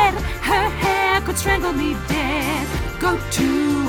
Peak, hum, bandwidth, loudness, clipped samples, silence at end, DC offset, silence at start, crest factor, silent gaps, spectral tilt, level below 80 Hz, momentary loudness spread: -4 dBFS; none; over 20 kHz; -20 LUFS; under 0.1%; 0 s; under 0.1%; 0 s; 16 dB; none; -4.5 dB/octave; -30 dBFS; 4 LU